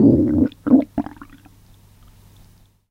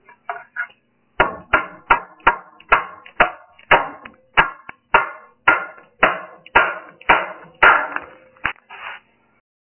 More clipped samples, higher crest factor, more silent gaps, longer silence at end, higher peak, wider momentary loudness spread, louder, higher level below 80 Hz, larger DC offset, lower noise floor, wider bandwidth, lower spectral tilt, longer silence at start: neither; about the same, 18 dB vs 20 dB; neither; first, 1.9 s vs 0.7 s; about the same, -2 dBFS vs 0 dBFS; second, 13 LU vs 17 LU; about the same, -18 LUFS vs -18 LUFS; about the same, -42 dBFS vs -44 dBFS; neither; second, -51 dBFS vs -56 dBFS; about the same, 4.1 kHz vs 4 kHz; first, -10.5 dB/octave vs -6.5 dB/octave; second, 0 s vs 0.3 s